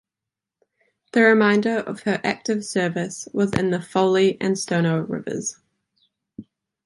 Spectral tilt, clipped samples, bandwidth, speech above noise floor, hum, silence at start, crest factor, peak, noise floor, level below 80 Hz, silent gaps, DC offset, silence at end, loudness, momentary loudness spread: -5 dB/octave; under 0.1%; 11.5 kHz; 66 dB; none; 1.15 s; 20 dB; -2 dBFS; -87 dBFS; -58 dBFS; none; under 0.1%; 0.45 s; -21 LUFS; 11 LU